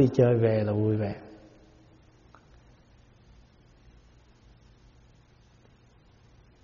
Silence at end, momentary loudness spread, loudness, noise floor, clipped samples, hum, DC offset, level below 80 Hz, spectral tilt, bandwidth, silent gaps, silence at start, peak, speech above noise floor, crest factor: 5.3 s; 19 LU; -25 LUFS; -59 dBFS; under 0.1%; none; under 0.1%; -58 dBFS; -9 dB/octave; 7 kHz; none; 0 s; -8 dBFS; 35 dB; 22 dB